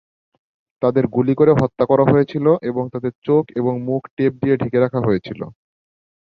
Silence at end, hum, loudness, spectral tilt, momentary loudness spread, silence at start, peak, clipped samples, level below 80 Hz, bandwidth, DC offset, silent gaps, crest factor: 0.9 s; none; -18 LUFS; -10 dB/octave; 10 LU; 0.8 s; -2 dBFS; under 0.1%; -52 dBFS; 6.4 kHz; under 0.1%; 3.15-3.22 s, 4.10-4.17 s; 16 dB